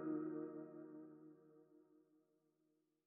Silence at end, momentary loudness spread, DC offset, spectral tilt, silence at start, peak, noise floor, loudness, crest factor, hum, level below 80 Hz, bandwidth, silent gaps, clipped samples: 1.05 s; 23 LU; under 0.1%; -6.5 dB/octave; 0 s; -34 dBFS; -84 dBFS; -51 LUFS; 18 dB; none; under -90 dBFS; 2.6 kHz; none; under 0.1%